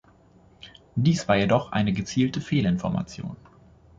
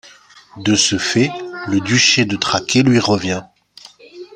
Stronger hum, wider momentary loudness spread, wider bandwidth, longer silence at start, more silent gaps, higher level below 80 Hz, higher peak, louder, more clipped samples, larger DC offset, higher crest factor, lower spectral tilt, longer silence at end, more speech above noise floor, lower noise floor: neither; first, 14 LU vs 11 LU; second, 7.8 kHz vs 11 kHz; first, 0.65 s vs 0.05 s; neither; about the same, -50 dBFS vs -54 dBFS; second, -6 dBFS vs 0 dBFS; second, -24 LUFS vs -15 LUFS; neither; neither; about the same, 20 dB vs 16 dB; first, -6.5 dB/octave vs -3.5 dB/octave; first, 0.65 s vs 0.1 s; about the same, 32 dB vs 29 dB; first, -56 dBFS vs -45 dBFS